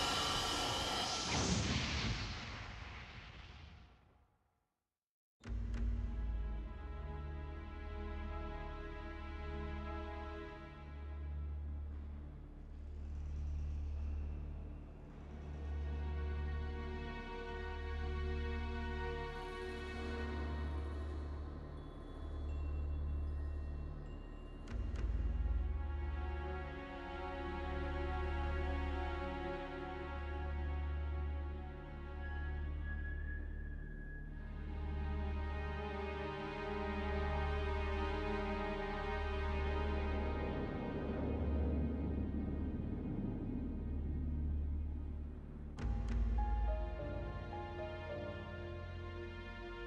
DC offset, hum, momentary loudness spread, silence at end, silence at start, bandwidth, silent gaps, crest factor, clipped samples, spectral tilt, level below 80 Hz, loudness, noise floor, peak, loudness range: under 0.1%; none; 11 LU; 0 s; 0 s; 12 kHz; 5.09-5.40 s; 18 dB; under 0.1%; -5 dB/octave; -44 dBFS; -43 LUFS; under -90 dBFS; -24 dBFS; 7 LU